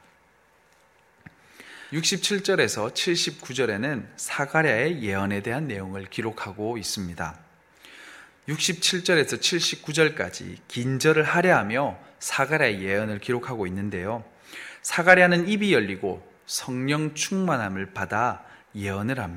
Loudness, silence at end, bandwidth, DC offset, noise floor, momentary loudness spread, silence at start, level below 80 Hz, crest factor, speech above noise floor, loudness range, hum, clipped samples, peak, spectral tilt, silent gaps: -24 LUFS; 0 s; 16.5 kHz; under 0.1%; -60 dBFS; 14 LU; 1.6 s; -62 dBFS; 24 dB; 36 dB; 5 LU; none; under 0.1%; 0 dBFS; -3.5 dB/octave; none